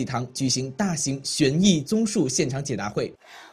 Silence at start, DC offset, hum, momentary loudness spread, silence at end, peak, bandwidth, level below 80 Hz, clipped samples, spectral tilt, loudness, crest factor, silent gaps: 0 s; under 0.1%; none; 9 LU; 0.05 s; -6 dBFS; 14.5 kHz; -54 dBFS; under 0.1%; -4.5 dB/octave; -24 LUFS; 18 dB; none